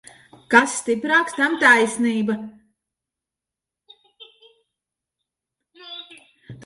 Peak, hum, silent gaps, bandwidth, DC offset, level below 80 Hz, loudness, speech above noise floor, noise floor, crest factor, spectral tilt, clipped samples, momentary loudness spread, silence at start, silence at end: 0 dBFS; none; none; 11.5 kHz; under 0.1%; -68 dBFS; -18 LUFS; 69 dB; -87 dBFS; 22 dB; -3 dB/octave; under 0.1%; 22 LU; 0.5 s; 0.1 s